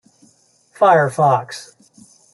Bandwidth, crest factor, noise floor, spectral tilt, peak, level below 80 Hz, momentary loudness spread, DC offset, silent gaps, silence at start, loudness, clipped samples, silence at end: 12 kHz; 16 dB; -56 dBFS; -5.5 dB/octave; -2 dBFS; -66 dBFS; 19 LU; under 0.1%; none; 0.8 s; -15 LUFS; under 0.1%; 0.7 s